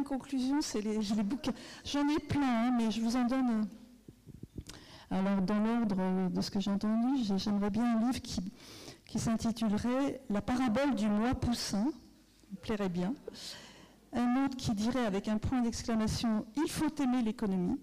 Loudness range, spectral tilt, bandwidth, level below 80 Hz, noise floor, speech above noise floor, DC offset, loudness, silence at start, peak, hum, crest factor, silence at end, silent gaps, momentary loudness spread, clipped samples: 3 LU; -5.5 dB/octave; 15 kHz; -54 dBFS; -60 dBFS; 28 dB; under 0.1%; -33 LUFS; 0 s; -28 dBFS; none; 6 dB; 0 s; none; 13 LU; under 0.1%